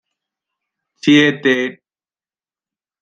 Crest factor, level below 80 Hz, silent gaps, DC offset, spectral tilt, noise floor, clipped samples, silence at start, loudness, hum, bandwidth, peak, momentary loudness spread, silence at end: 18 dB; -64 dBFS; none; under 0.1%; -5 dB/octave; under -90 dBFS; under 0.1%; 1.05 s; -14 LUFS; none; 7.8 kHz; -2 dBFS; 10 LU; 1.3 s